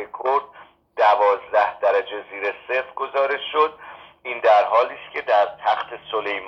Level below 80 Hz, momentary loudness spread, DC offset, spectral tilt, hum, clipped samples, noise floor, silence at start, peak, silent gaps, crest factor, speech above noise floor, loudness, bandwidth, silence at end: -68 dBFS; 13 LU; under 0.1%; -3.5 dB/octave; none; under 0.1%; -48 dBFS; 0 s; -4 dBFS; none; 16 dB; 25 dB; -21 LUFS; 7.6 kHz; 0 s